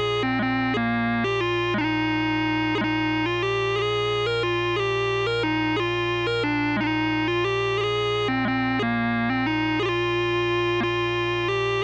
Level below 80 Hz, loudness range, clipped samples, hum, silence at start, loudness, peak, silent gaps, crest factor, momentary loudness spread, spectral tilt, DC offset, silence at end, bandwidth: -46 dBFS; 0 LU; under 0.1%; 60 Hz at -75 dBFS; 0 s; -23 LUFS; -14 dBFS; none; 10 dB; 1 LU; -6 dB/octave; under 0.1%; 0 s; 8.4 kHz